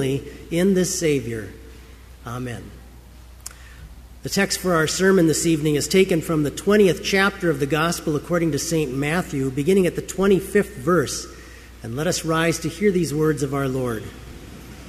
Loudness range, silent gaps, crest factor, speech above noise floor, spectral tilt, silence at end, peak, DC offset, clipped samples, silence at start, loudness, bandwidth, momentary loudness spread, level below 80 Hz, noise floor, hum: 8 LU; none; 18 dB; 23 dB; -5 dB/octave; 0 s; -4 dBFS; under 0.1%; under 0.1%; 0 s; -21 LUFS; 15.5 kHz; 20 LU; -44 dBFS; -43 dBFS; none